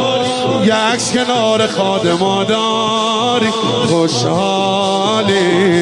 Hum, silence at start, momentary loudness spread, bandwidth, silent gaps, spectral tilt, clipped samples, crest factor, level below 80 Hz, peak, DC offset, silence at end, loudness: none; 0 s; 2 LU; 11.5 kHz; none; -4 dB/octave; under 0.1%; 12 dB; -54 dBFS; -2 dBFS; under 0.1%; 0 s; -14 LUFS